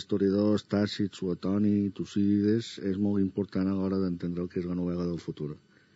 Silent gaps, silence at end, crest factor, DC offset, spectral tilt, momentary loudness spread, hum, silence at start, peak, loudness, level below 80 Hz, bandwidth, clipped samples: none; 0.4 s; 14 dB; under 0.1%; -7.5 dB/octave; 8 LU; none; 0 s; -14 dBFS; -29 LUFS; -62 dBFS; 8 kHz; under 0.1%